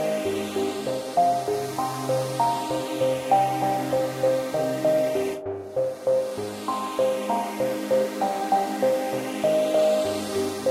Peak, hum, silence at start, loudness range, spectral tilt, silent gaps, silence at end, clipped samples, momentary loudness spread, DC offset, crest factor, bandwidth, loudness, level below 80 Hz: -8 dBFS; none; 0 s; 2 LU; -5 dB/octave; none; 0 s; under 0.1%; 6 LU; under 0.1%; 16 dB; 16 kHz; -25 LUFS; -64 dBFS